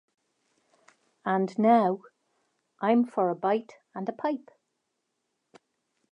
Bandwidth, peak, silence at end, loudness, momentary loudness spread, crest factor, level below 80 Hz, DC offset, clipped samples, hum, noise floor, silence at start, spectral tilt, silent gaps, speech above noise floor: 8.2 kHz; -8 dBFS; 1.75 s; -27 LUFS; 15 LU; 22 dB; -86 dBFS; under 0.1%; under 0.1%; none; -80 dBFS; 1.25 s; -8 dB/octave; none; 54 dB